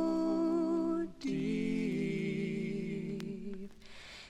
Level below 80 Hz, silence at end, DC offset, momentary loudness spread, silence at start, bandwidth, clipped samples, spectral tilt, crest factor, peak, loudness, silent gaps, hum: -60 dBFS; 0 s; under 0.1%; 14 LU; 0 s; 10 kHz; under 0.1%; -7 dB/octave; 12 dB; -22 dBFS; -35 LUFS; none; none